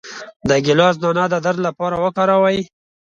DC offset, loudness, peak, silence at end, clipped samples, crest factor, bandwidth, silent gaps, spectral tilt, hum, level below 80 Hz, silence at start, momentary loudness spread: under 0.1%; -17 LUFS; 0 dBFS; 0.5 s; under 0.1%; 16 dB; 7.6 kHz; 0.36-0.40 s; -5.5 dB/octave; none; -52 dBFS; 0.05 s; 10 LU